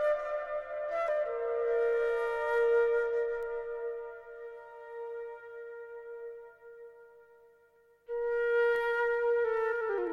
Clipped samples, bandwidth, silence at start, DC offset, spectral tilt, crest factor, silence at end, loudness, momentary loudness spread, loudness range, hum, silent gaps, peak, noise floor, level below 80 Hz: under 0.1%; 6 kHz; 0 s; under 0.1%; -4 dB/octave; 14 dB; 0 s; -31 LUFS; 18 LU; 15 LU; 50 Hz at -90 dBFS; none; -20 dBFS; -65 dBFS; -64 dBFS